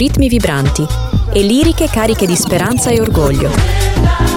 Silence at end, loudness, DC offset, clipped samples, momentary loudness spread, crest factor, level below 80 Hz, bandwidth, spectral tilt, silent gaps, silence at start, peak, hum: 0 s; -12 LUFS; 0.2%; under 0.1%; 3 LU; 12 dB; -18 dBFS; 17.5 kHz; -5 dB/octave; none; 0 s; 0 dBFS; none